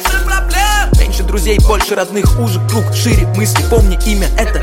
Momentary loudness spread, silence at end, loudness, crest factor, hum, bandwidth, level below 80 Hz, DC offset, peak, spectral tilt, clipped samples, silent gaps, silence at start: 3 LU; 0 s; -13 LUFS; 10 dB; none; 16.5 kHz; -14 dBFS; under 0.1%; 0 dBFS; -4.5 dB/octave; under 0.1%; none; 0 s